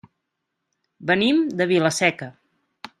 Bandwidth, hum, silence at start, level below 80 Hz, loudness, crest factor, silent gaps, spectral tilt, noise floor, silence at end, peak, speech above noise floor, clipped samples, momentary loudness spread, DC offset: 13.5 kHz; none; 1 s; -66 dBFS; -20 LUFS; 20 dB; none; -4.5 dB/octave; -79 dBFS; 0.7 s; -4 dBFS; 59 dB; under 0.1%; 16 LU; under 0.1%